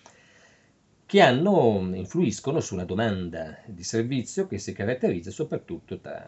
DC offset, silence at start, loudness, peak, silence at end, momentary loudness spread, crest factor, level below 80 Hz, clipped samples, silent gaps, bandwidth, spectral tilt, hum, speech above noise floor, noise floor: under 0.1%; 1.1 s; -25 LUFS; -4 dBFS; 0.05 s; 17 LU; 22 dB; -60 dBFS; under 0.1%; none; 8.4 kHz; -5.5 dB/octave; none; 37 dB; -62 dBFS